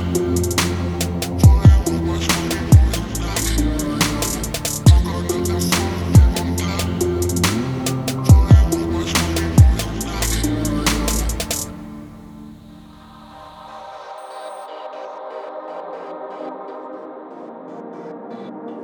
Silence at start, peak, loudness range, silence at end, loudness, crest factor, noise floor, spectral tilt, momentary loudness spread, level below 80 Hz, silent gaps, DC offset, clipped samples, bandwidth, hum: 0 s; 0 dBFS; 16 LU; 0 s; -17 LUFS; 18 dB; -41 dBFS; -5 dB/octave; 21 LU; -24 dBFS; none; under 0.1%; under 0.1%; over 20 kHz; none